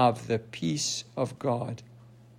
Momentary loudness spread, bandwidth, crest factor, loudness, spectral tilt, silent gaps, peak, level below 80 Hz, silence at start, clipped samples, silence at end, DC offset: 7 LU; 16 kHz; 20 dB; -30 LUFS; -4.5 dB/octave; none; -10 dBFS; -66 dBFS; 0 s; under 0.1%; 0.3 s; under 0.1%